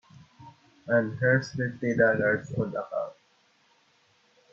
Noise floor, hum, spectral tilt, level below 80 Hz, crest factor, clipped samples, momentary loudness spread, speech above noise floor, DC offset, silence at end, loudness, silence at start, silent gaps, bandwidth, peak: -65 dBFS; none; -7.5 dB/octave; -66 dBFS; 20 dB; under 0.1%; 11 LU; 40 dB; under 0.1%; 1.4 s; -27 LUFS; 0.4 s; none; 7.4 kHz; -10 dBFS